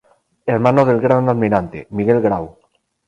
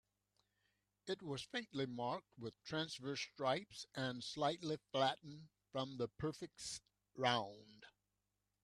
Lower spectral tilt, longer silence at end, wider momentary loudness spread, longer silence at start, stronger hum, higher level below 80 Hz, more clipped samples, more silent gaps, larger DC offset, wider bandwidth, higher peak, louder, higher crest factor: first, -9.5 dB/octave vs -4.5 dB/octave; second, 0.6 s vs 0.75 s; about the same, 12 LU vs 14 LU; second, 0.45 s vs 1.05 s; second, none vs 50 Hz at -80 dBFS; first, -48 dBFS vs -78 dBFS; neither; neither; neither; second, 9.2 kHz vs 13 kHz; first, 0 dBFS vs -20 dBFS; first, -16 LUFS vs -43 LUFS; second, 16 dB vs 24 dB